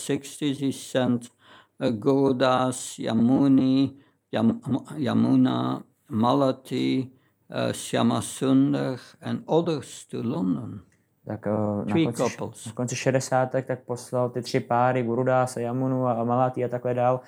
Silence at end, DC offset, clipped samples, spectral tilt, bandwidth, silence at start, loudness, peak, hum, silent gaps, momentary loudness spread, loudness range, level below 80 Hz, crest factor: 0.05 s; under 0.1%; under 0.1%; -6 dB/octave; 16 kHz; 0 s; -25 LUFS; -6 dBFS; none; none; 11 LU; 4 LU; -72 dBFS; 18 dB